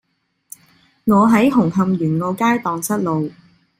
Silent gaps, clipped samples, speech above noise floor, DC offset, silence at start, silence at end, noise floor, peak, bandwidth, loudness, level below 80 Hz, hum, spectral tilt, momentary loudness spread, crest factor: none; under 0.1%; 50 dB; under 0.1%; 1.05 s; 0.5 s; -66 dBFS; -2 dBFS; 16 kHz; -17 LUFS; -54 dBFS; none; -6.5 dB/octave; 9 LU; 16 dB